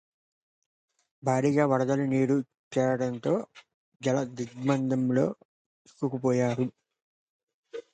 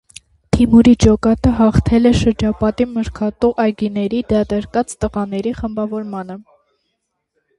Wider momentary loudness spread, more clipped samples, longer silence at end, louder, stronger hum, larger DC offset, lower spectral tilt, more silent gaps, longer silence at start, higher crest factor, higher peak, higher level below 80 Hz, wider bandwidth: about the same, 10 LU vs 12 LU; neither; second, 0.1 s vs 1.15 s; second, -28 LUFS vs -16 LUFS; neither; neither; about the same, -7 dB/octave vs -7 dB/octave; first, 2.59-2.71 s, 3.74-4.00 s, 5.45-5.85 s, 7.02-7.47 s, 7.54-7.63 s vs none; first, 1.25 s vs 0.55 s; about the same, 18 dB vs 16 dB; second, -10 dBFS vs 0 dBFS; second, -72 dBFS vs -30 dBFS; second, 9.2 kHz vs 11.5 kHz